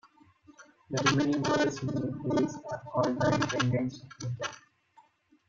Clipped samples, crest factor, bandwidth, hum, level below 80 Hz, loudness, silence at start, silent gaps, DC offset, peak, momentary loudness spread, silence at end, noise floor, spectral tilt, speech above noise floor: under 0.1%; 20 dB; 7.8 kHz; none; -62 dBFS; -30 LUFS; 0.5 s; none; under 0.1%; -10 dBFS; 11 LU; 0.9 s; -63 dBFS; -5.5 dB/octave; 34 dB